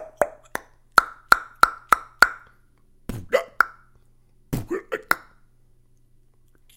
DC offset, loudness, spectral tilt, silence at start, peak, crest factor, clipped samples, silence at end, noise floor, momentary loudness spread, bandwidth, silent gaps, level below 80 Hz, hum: under 0.1%; -22 LUFS; -3 dB/octave; 0 s; 0 dBFS; 26 dB; under 0.1%; 1.6 s; -56 dBFS; 17 LU; 16.5 kHz; none; -48 dBFS; none